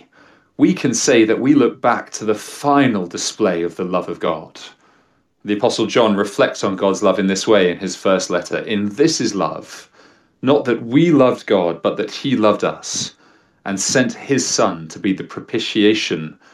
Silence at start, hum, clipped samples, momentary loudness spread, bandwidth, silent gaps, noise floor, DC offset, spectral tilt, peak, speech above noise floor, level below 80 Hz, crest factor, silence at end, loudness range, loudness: 0.6 s; none; under 0.1%; 10 LU; 13 kHz; none; -59 dBFS; under 0.1%; -4.5 dB/octave; -2 dBFS; 42 dB; -64 dBFS; 16 dB; 0.25 s; 4 LU; -17 LUFS